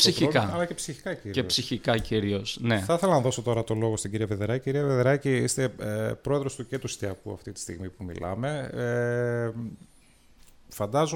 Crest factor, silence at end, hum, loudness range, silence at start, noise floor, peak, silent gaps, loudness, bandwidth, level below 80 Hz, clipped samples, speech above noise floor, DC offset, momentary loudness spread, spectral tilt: 22 dB; 0 s; none; 6 LU; 0 s; -57 dBFS; -6 dBFS; none; -28 LUFS; 17 kHz; -52 dBFS; under 0.1%; 30 dB; under 0.1%; 13 LU; -4.5 dB/octave